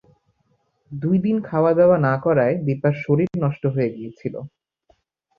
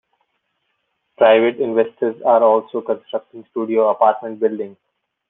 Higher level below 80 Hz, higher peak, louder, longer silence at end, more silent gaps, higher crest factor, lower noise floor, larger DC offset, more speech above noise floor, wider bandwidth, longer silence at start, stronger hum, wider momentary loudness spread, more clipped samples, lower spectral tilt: first, -58 dBFS vs -70 dBFS; about the same, -4 dBFS vs -2 dBFS; second, -20 LUFS vs -17 LUFS; first, 0.9 s vs 0.55 s; neither; about the same, 16 dB vs 16 dB; second, -67 dBFS vs -71 dBFS; neither; second, 47 dB vs 54 dB; first, 5.2 kHz vs 3.9 kHz; second, 0.9 s vs 1.2 s; neither; about the same, 15 LU vs 15 LU; neither; first, -11 dB/octave vs -8.5 dB/octave